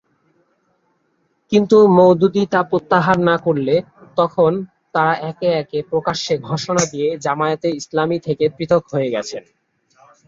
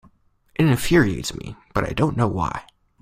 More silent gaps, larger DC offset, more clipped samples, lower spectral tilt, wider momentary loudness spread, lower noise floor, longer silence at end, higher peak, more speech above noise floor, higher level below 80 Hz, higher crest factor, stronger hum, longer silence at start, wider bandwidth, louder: neither; neither; neither; about the same, -5.5 dB/octave vs -6 dB/octave; second, 10 LU vs 15 LU; first, -65 dBFS vs -57 dBFS; first, 0.9 s vs 0.4 s; about the same, -2 dBFS vs -4 dBFS; first, 49 dB vs 37 dB; second, -56 dBFS vs -40 dBFS; about the same, 16 dB vs 18 dB; neither; first, 1.5 s vs 0.6 s; second, 7.8 kHz vs 16 kHz; first, -17 LUFS vs -21 LUFS